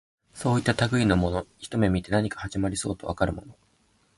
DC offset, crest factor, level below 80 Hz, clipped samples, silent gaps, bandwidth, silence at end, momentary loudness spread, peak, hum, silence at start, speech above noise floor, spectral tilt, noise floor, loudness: under 0.1%; 18 dB; -42 dBFS; under 0.1%; none; 11.5 kHz; 0.65 s; 9 LU; -8 dBFS; none; 0.35 s; 40 dB; -6 dB/octave; -65 dBFS; -26 LUFS